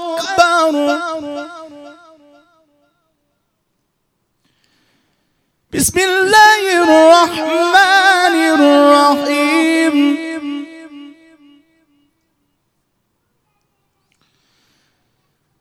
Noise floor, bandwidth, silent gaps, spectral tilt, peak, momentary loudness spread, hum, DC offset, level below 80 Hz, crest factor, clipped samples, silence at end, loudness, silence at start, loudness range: -68 dBFS; 18 kHz; none; -2.5 dB/octave; 0 dBFS; 18 LU; none; under 0.1%; -54 dBFS; 16 dB; 0.2%; 4.5 s; -11 LUFS; 0 s; 16 LU